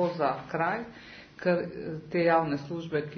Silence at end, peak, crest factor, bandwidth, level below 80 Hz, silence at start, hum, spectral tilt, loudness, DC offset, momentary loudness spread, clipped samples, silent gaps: 0 s; -12 dBFS; 18 dB; 6.4 kHz; -64 dBFS; 0 s; none; -7.5 dB/octave; -29 LUFS; under 0.1%; 15 LU; under 0.1%; none